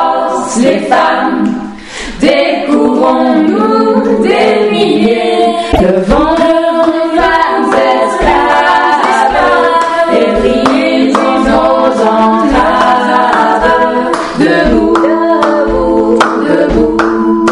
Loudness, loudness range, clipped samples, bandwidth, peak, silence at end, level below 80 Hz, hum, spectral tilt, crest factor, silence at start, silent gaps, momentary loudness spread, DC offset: -9 LUFS; 1 LU; under 0.1%; 11 kHz; 0 dBFS; 0 s; -28 dBFS; none; -5 dB/octave; 8 dB; 0 s; none; 3 LU; 0.4%